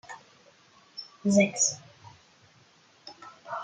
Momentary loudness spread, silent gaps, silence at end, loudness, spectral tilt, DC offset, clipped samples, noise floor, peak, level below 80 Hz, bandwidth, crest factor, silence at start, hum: 24 LU; none; 0 s; -25 LUFS; -3.5 dB/octave; under 0.1%; under 0.1%; -60 dBFS; -8 dBFS; -74 dBFS; 9.8 kHz; 22 dB; 0.1 s; none